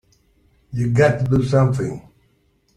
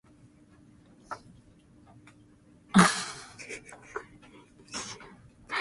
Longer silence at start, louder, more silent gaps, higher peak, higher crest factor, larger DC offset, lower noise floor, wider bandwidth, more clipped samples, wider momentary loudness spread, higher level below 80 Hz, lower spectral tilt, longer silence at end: second, 0.7 s vs 1.1 s; first, -18 LUFS vs -29 LUFS; neither; about the same, -2 dBFS vs -4 dBFS; second, 18 dB vs 30 dB; neither; about the same, -61 dBFS vs -58 dBFS; second, 10 kHz vs 11.5 kHz; neither; second, 13 LU vs 23 LU; first, -46 dBFS vs -64 dBFS; first, -8 dB/octave vs -4 dB/octave; first, 0.75 s vs 0 s